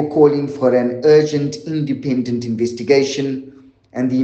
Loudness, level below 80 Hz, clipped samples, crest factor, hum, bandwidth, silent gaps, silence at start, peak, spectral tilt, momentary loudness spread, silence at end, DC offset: -17 LUFS; -60 dBFS; under 0.1%; 16 dB; none; 8.2 kHz; none; 0 s; 0 dBFS; -6.5 dB/octave; 10 LU; 0 s; under 0.1%